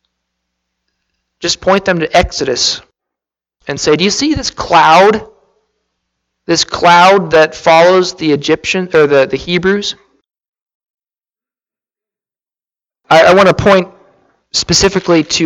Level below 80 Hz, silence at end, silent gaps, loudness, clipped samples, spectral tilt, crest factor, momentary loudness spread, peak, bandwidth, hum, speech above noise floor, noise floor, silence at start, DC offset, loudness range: -38 dBFS; 0 s; 10.48-10.53 s, 10.62-10.66 s, 10.74-10.80 s, 10.90-10.94 s; -10 LUFS; under 0.1%; -3.5 dB/octave; 12 dB; 10 LU; 0 dBFS; 16 kHz; none; over 80 dB; under -90 dBFS; 1.4 s; under 0.1%; 6 LU